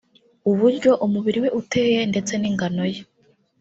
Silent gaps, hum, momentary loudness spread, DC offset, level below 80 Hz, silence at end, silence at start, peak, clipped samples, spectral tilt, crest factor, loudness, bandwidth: none; none; 8 LU; under 0.1%; -60 dBFS; 0.6 s; 0.45 s; -4 dBFS; under 0.1%; -5.5 dB/octave; 16 dB; -21 LUFS; 8 kHz